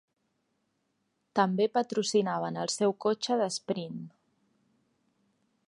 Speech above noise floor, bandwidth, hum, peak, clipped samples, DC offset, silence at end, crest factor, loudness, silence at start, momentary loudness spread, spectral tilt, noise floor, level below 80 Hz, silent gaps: 49 dB; 11.5 kHz; none; -10 dBFS; under 0.1%; under 0.1%; 1.6 s; 22 dB; -29 LUFS; 1.35 s; 8 LU; -4.5 dB/octave; -78 dBFS; -82 dBFS; none